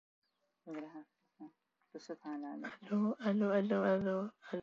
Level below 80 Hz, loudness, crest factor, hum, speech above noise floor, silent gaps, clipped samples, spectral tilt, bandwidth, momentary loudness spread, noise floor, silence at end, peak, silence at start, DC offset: -82 dBFS; -37 LUFS; 18 dB; none; 26 dB; none; under 0.1%; -8 dB/octave; 7.2 kHz; 24 LU; -63 dBFS; 0 s; -22 dBFS; 0.65 s; under 0.1%